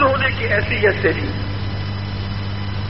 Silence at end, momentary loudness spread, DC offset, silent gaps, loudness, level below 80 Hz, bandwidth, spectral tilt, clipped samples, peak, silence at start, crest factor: 0 s; 9 LU; 2%; none; -20 LUFS; -34 dBFS; 5.8 kHz; -4 dB/octave; under 0.1%; -4 dBFS; 0 s; 16 dB